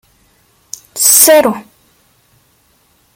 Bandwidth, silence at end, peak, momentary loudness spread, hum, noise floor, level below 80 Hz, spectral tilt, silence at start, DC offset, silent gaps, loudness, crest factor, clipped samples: over 20 kHz; 1.55 s; 0 dBFS; 25 LU; none; -54 dBFS; -58 dBFS; -1 dB/octave; 0.95 s; under 0.1%; none; -7 LUFS; 14 dB; 0.3%